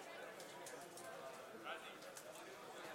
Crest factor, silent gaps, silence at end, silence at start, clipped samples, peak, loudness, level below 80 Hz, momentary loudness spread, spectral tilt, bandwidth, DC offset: 18 dB; none; 0 s; 0 s; under 0.1%; -36 dBFS; -53 LUFS; under -90 dBFS; 4 LU; -2 dB/octave; 16 kHz; under 0.1%